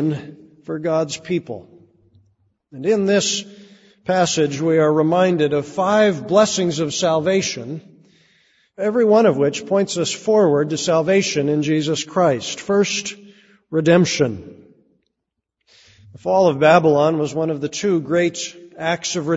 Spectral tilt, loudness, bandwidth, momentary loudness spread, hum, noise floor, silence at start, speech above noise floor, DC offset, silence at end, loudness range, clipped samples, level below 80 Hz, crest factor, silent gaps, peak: -4.5 dB/octave; -18 LUFS; 8 kHz; 11 LU; none; -79 dBFS; 0 s; 61 dB; under 0.1%; 0 s; 5 LU; under 0.1%; -60 dBFS; 18 dB; none; 0 dBFS